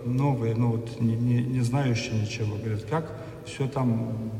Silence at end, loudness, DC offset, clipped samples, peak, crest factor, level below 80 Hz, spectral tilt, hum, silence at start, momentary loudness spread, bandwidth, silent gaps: 0 s; -27 LUFS; under 0.1%; under 0.1%; -14 dBFS; 12 dB; -54 dBFS; -7 dB/octave; none; 0 s; 6 LU; 11.5 kHz; none